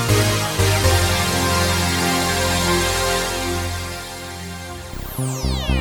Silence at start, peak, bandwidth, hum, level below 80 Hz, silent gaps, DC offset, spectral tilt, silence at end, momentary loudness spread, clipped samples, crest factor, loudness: 0 s; -4 dBFS; 19.5 kHz; none; -30 dBFS; none; under 0.1%; -3.5 dB/octave; 0 s; 14 LU; under 0.1%; 16 dB; -19 LUFS